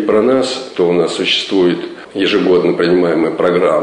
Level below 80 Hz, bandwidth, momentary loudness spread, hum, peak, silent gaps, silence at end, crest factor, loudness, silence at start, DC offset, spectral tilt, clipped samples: -54 dBFS; 10.5 kHz; 5 LU; none; -2 dBFS; none; 0 s; 10 dB; -13 LUFS; 0 s; under 0.1%; -5 dB/octave; under 0.1%